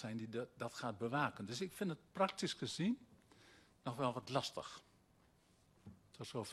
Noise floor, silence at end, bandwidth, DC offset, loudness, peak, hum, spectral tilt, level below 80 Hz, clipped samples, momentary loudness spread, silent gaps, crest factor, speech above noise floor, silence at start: -72 dBFS; 0 s; 13 kHz; under 0.1%; -43 LUFS; -22 dBFS; none; -5 dB/octave; -78 dBFS; under 0.1%; 14 LU; none; 22 dB; 30 dB; 0 s